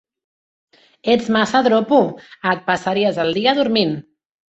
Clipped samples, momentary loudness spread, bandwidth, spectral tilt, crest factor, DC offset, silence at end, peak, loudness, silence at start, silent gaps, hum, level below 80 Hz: under 0.1%; 8 LU; 8.2 kHz; -5.5 dB/octave; 16 dB; under 0.1%; 0.5 s; -2 dBFS; -17 LUFS; 1.05 s; none; none; -60 dBFS